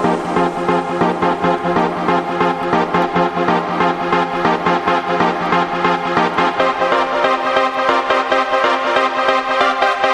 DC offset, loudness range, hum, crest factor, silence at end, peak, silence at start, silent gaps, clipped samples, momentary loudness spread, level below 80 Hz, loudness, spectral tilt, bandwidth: under 0.1%; 1 LU; none; 14 dB; 0 s; -2 dBFS; 0 s; none; under 0.1%; 2 LU; -48 dBFS; -16 LUFS; -5.5 dB/octave; 12 kHz